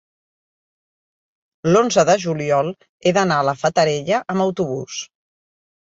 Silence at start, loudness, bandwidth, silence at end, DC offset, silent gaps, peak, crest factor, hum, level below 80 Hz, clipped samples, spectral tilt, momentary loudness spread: 1.65 s; -18 LUFS; 8 kHz; 0.9 s; under 0.1%; 2.89-3.00 s; -2 dBFS; 18 dB; none; -60 dBFS; under 0.1%; -5 dB/octave; 12 LU